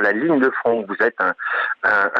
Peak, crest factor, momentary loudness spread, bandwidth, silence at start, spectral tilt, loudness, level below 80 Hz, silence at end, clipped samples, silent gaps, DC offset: -4 dBFS; 16 dB; 4 LU; 7.4 kHz; 0 s; -7 dB/octave; -19 LUFS; -64 dBFS; 0 s; under 0.1%; none; under 0.1%